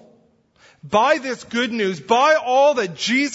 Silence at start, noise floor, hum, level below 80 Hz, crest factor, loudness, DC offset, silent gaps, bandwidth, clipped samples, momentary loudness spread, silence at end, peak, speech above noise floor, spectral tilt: 0.85 s; -57 dBFS; none; -66 dBFS; 16 dB; -18 LUFS; under 0.1%; none; 8 kHz; under 0.1%; 7 LU; 0 s; -2 dBFS; 39 dB; -3.5 dB/octave